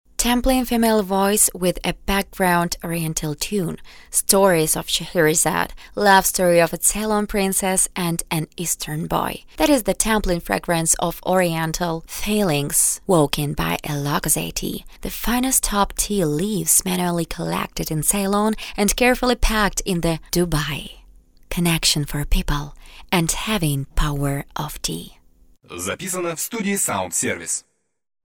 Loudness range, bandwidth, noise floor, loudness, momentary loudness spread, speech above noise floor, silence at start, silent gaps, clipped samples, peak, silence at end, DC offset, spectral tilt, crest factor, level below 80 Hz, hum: 6 LU; over 20 kHz; -52 dBFS; -20 LUFS; 10 LU; 32 dB; 0.2 s; none; under 0.1%; 0 dBFS; 0.65 s; under 0.1%; -3.5 dB/octave; 20 dB; -32 dBFS; none